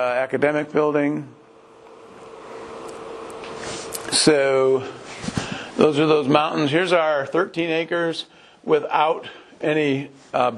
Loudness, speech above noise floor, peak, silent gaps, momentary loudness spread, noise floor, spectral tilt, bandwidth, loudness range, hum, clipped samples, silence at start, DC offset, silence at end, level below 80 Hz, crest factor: -21 LUFS; 27 dB; 0 dBFS; none; 18 LU; -47 dBFS; -4 dB/octave; 12 kHz; 7 LU; none; under 0.1%; 0 s; under 0.1%; 0 s; -58 dBFS; 22 dB